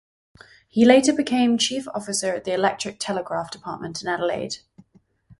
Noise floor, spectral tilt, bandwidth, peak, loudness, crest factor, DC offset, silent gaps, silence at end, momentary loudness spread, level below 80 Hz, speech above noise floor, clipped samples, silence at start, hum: -58 dBFS; -3.5 dB/octave; 11.5 kHz; 0 dBFS; -22 LUFS; 22 dB; under 0.1%; none; 0.85 s; 16 LU; -62 dBFS; 37 dB; under 0.1%; 0.75 s; none